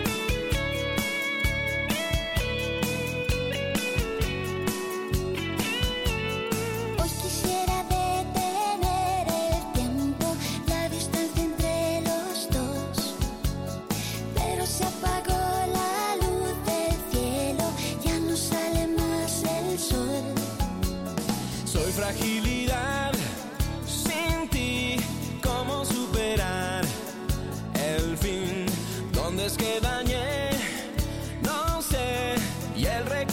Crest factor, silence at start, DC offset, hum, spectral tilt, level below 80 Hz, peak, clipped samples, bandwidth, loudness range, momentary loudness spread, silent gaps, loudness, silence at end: 14 dB; 0 s; under 0.1%; none; -4.5 dB/octave; -36 dBFS; -12 dBFS; under 0.1%; 17 kHz; 2 LU; 4 LU; none; -28 LUFS; 0 s